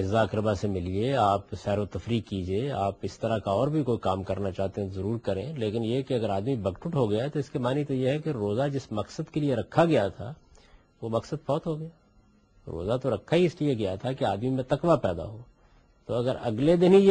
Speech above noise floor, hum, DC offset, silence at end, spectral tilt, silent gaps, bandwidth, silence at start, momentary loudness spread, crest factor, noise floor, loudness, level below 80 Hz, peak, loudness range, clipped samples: 34 dB; none; under 0.1%; 0 s; -7.5 dB/octave; none; 9 kHz; 0 s; 9 LU; 20 dB; -61 dBFS; -28 LUFS; -54 dBFS; -6 dBFS; 2 LU; under 0.1%